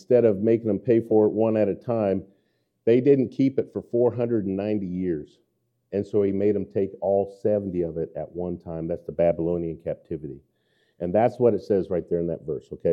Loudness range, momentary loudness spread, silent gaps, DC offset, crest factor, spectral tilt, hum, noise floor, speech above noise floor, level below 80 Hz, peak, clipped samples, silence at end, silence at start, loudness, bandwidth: 5 LU; 12 LU; none; under 0.1%; 16 dB; -10 dB/octave; none; -70 dBFS; 47 dB; -58 dBFS; -8 dBFS; under 0.1%; 0 s; 0.1 s; -24 LUFS; 6.4 kHz